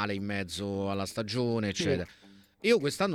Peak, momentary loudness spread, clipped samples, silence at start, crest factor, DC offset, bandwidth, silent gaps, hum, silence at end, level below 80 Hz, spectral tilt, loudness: -12 dBFS; 7 LU; under 0.1%; 0 s; 18 dB; under 0.1%; 16 kHz; none; none; 0 s; -64 dBFS; -5 dB/octave; -31 LUFS